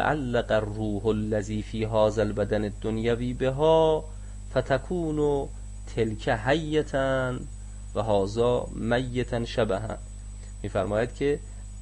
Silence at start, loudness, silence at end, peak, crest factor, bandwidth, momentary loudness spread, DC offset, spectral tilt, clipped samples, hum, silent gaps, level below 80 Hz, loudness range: 0 s; -27 LUFS; 0 s; -10 dBFS; 16 dB; 11 kHz; 13 LU; under 0.1%; -6.5 dB/octave; under 0.1%; 50 Hz at -40 dBFS; none; -38 dBFS; 3 LU